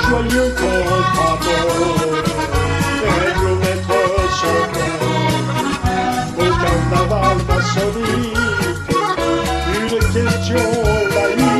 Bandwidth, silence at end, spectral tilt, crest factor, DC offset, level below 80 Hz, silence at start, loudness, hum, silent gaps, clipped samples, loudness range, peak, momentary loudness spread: 14.5 kHz; 0 s; -5 dB/octave; 16 dB; under 0.1%; -28 dBFS; 0 s; -16 LUFS; none; none; under 0.1%; 1 LU; 0 dBFS; 3 LU